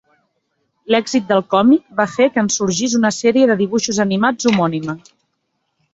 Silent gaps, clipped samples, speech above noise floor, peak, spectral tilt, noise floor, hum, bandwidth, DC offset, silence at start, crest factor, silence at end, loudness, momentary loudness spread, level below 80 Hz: none; under 0.1%; 55 dB; 0 dBFS; -4.5 dB/octave; -70 dBFS; none; 8 kHz; under 0.1%; 0.9 s; 16 dB; 0.95 s; -16 LUFS; 6 LU; -56 dBFS